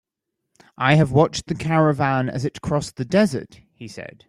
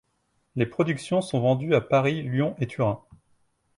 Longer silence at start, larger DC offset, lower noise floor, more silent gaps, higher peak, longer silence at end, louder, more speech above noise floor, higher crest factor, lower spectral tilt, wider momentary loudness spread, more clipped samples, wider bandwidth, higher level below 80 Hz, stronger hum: first, 0.8 s vs 0.55 s; neither; first, -80 dBFS vs -72 dBFS; neither; first, -2 dBFS vs -8 dBFS; second, 0.2 s vs 0.8 s; first, -20 LUFS vs -25 LUFS; first, 60 dB vs 47 dB; about the same, 18 dB vs 18 dB; about the same, -6.5 dB/octave vs -7 dB/octave; first, 18 LU vs 7 LU; neither; about the same, 12 kHz vs 11.5 kHz; first, -50 dBFS vs -58 dBFS; neither